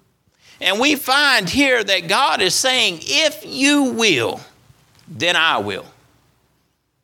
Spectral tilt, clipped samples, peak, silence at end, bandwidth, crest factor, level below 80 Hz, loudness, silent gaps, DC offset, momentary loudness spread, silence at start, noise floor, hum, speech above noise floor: -2 dB/octave; under 0.1%; 0 dBFS; 1.2 s; 18.5 kHz; 18 dB; -56 dBFS; -16 LUFS; none; under 0.1%; 7 LU; 0.6 s; -65 dBFS; none; 48 dB